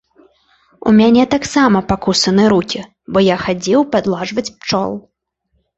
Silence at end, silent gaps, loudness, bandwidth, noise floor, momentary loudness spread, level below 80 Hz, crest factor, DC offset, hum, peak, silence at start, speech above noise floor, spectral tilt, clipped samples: 0.8 s; none; -14 LUFS; 8.2 kHz; -66 dBFS; 11 LU; -44 dBFS; 14 dB; under 0.1%; none; 0 dBFS; 0.85 s; 53 dB; -5 dB/octave; under 0.1%